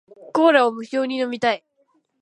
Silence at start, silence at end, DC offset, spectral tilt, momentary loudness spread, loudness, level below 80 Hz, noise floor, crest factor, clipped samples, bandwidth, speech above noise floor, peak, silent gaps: 0.25 s; 0.65 s; under 0.1%; -4.5 dB/octave; 10 LU; -20 LUFS; -74 dBFS; -65 dBFS; 18 dB; under 0.1%; 11 kHz; 46 dB; -2 dBFS; none